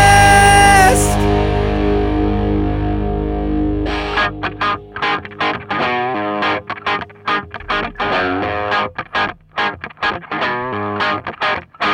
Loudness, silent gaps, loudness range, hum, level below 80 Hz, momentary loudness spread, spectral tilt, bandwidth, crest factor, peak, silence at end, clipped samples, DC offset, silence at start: -16 LUFS; none; 6 LU; none; -26 dBFS; 12 LU; -4 dB/octave; 18 kHz; 16 dB; 0 dBFS; 0 s; under 0.1%; under 0.1%; 0 s